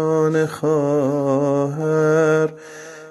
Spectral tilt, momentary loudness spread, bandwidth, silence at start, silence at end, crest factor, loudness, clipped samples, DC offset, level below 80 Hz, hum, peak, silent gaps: -7.5 dB/octave; 12 LU; 12.5 kHz; 0 s; 0 s; 14 dB; -18 LUFS; under 0.1%; under 0.1%; -64 dBFS; none; -4 dBFS; none